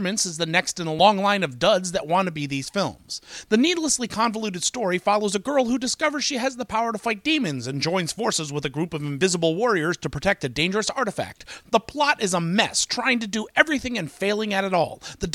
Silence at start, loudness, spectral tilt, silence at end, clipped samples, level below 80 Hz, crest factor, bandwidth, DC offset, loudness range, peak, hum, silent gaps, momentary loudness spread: 0 s; -23 LUFS; -3.5 dB/octave; 0 s; under 0.1%; -52 dBFS; 22 dB; 16 kHz; under 0.1%; 2 LU; 0 dBFS; none; none; 7 LU